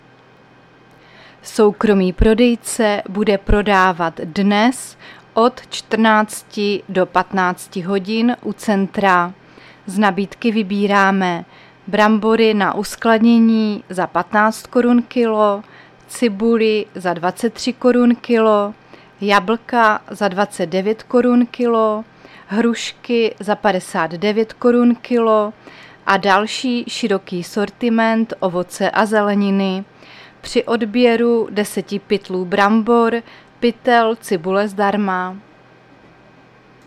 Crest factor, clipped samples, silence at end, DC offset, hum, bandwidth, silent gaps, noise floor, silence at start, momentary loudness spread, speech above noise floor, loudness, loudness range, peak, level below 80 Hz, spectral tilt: 16 dB; under 0.1%; 1.5 s; under 0.1%; none; 14 kHz; none; -47 dBFS; 1.45 s; 9 LU; 31 dB; -16 LUFS; 3 LU; 0 dBFS; -36 dBFS; -5.5 dB/octave